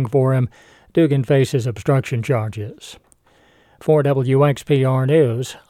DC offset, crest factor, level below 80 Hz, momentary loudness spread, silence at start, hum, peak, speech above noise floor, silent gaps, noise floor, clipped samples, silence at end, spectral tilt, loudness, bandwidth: under 0.1%; 14 dB; -56 dBFS; 12 LU; 0 s; none; -4 dBFS; 37 dB; none; -55 dBFS; under 0.1%; 0.15 s; -7.5 dB/octave; -18 LUFS; 13 kHz